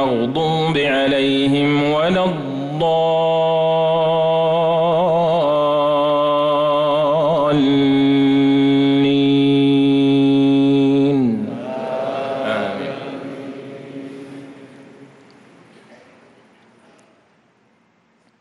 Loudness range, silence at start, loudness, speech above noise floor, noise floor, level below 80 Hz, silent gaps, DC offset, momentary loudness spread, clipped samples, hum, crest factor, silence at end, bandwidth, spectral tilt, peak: 13 LU; 0 s; -16 LUFS; 42 dB; -58 dBFS; -56 dBFS; none; under 0.1%; 14 LU; under 0.1%; none; 8 dB; 3.35 s; 10 kHz; -7.5 dB/octave; -8 dBFS